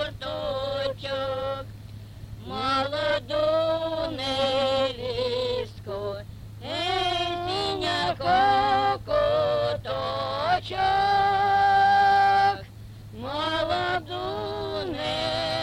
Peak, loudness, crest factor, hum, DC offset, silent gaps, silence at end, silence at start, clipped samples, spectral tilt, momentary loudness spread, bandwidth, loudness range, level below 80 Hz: -10 dBFS; -25 LUFS; 14 dB; none; under 0.1%; none; 0 s; 0 s; under 0.1%; -4.5 dB/octave; 15 LU; 15 kHz; 6 LU; -48 dBFS